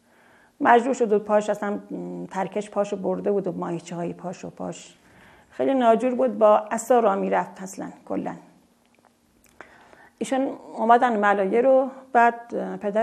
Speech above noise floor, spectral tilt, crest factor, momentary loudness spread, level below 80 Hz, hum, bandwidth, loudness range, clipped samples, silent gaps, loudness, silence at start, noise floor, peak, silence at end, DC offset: 38 dB; -5.5 dB/octave; 22 dB; 16 LU; -74 dBFS; none; 13 kHz; 8 LU; under 0.1%; none; -22 LUFS; 0.6 s; -60 dBFS; -2 dBFS; 0 s; under 0.1%